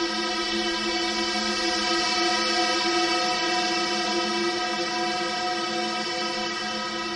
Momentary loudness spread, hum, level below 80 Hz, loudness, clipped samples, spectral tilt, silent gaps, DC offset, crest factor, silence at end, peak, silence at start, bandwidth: 4 LU; none; -56 dBFS; -24 LUFS; under 0.1%; -1.5 dB/octave; none; under 0.1%; 14 dB; 0 s; -12 dBFS; 0 s; 11.5 kHz